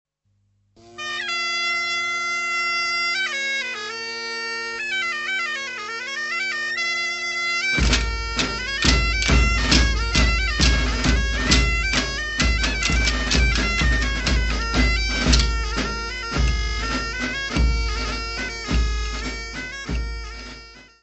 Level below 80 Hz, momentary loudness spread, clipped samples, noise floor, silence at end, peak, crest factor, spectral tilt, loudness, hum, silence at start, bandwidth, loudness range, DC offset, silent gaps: -26 dBFS; 10 LU; under 0.1%; -67 dBFS; 0.2 s; 0 dBFS; 22 dB; -3.5 dB/octave; -21 LUFS; 50 Hz at -55 dBFS; 0.85 s; 8.4 kHz; 6 LU; under 0.1%; none